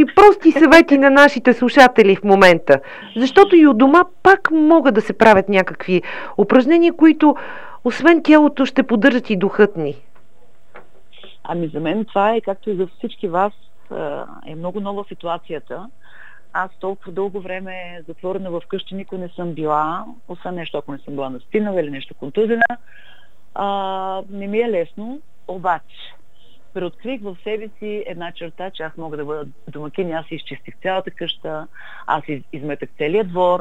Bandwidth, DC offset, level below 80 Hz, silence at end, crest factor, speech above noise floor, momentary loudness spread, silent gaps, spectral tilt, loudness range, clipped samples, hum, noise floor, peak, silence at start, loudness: 12.5 kHz; 2%; -52 dBFS; 0 s; 16 dB; 39 dB; 20 LU; none; -6 dB/octave; 16 LU; under 0.1%; none; -56 dBFS; 0 dBFS; 0 s; -15 LUFS